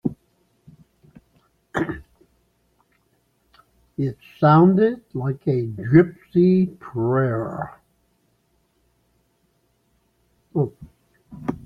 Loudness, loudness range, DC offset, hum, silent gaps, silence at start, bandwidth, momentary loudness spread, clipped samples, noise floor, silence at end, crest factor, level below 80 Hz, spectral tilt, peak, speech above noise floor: -21 LUFS; 17 LU; under 0.1%; none; none; 0.05 s; 5.4 kHz; 15 LU; under 0.1%; -66 dBFS; 0.05 s; 22 dB; -56 dBFS; -10 dB/octave; -2 dBFS; 47 dB